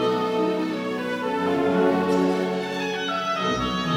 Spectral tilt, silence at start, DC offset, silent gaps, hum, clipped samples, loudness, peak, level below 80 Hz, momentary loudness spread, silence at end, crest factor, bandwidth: -5.5 dB/octave; 0 s; under 0.1%; none; none; under 0.1%; -24 LUFS; -8 dBFS; -52 dBFS; 6 LU; 0 s; 16 dB; 16.5 kHz